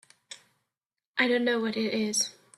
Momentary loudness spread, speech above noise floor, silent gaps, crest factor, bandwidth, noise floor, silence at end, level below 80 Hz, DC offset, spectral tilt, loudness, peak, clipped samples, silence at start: 22 LU; 62 dB; 1.06-1.14 s; 20 dB; 14 kHz; -89 dBFS; 0.25 s; -76 dBFS; under 0.1%; -2.5 dB/octave; -27 LUFS; -10 dBFS; under 0.1%; 0.3 s